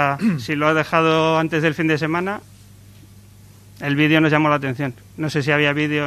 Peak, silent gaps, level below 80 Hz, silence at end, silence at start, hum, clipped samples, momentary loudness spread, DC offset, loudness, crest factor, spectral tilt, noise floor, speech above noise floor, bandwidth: 0 dBFS; none; -56 dBFS; 0 s; 0 s; none; under 0.1%; 12 LU; under 0.1%; -19 LUFS; 18 dB; -6 dB/octave; -45 dBFS; 27 dB; 14 kHz